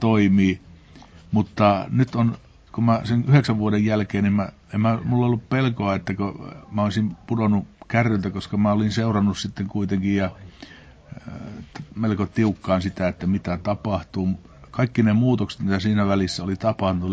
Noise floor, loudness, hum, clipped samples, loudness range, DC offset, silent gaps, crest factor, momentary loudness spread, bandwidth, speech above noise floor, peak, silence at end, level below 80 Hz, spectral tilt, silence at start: -46 dBFS; -22 LUFS; none; under 0.1%; 5 LU; under 0.1%; none; 18 dB; 12 LU; 8 kHz; 25 dB; -4 dBFS; 0 s; -44 dBFS; -7.5 dB/octave; 0 s